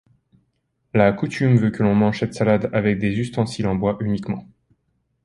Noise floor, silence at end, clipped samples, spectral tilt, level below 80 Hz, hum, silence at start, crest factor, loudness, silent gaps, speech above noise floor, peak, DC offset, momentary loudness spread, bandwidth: -70 dBFS; 0.8 s; under 0.1%; -7.5 dB/octave; -48 dBFS; none; 0.95 s; 18 dB; -20 LUFS; none; 51 dB; -2 dBFS; under 0.1%; 7 LU; 11 kHz